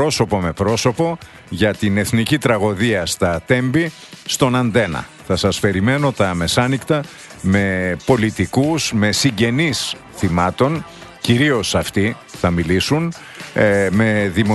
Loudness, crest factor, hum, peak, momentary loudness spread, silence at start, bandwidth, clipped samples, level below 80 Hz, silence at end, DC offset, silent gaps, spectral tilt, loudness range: -17 LUFS; 18 dB; none; 0 dBFS; 8 LU; 0 s; 12.5 kHz; under 0.1%; -42 dBFS; 0 s; under 0.1%; none; -5 dB/octave; 1 LU